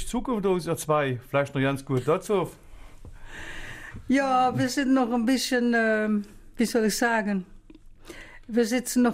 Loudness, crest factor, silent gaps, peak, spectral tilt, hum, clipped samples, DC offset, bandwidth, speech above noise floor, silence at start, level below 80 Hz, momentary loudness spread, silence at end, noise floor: -25 LUFS; 14 dB; none; -12 dBFS; -5 dB/octave; none; under 0.1%; under 0.1%; 16 kHz; 24 dB; 0 s; -48 dBFS; 17 LU; 0 s; -48 dBFS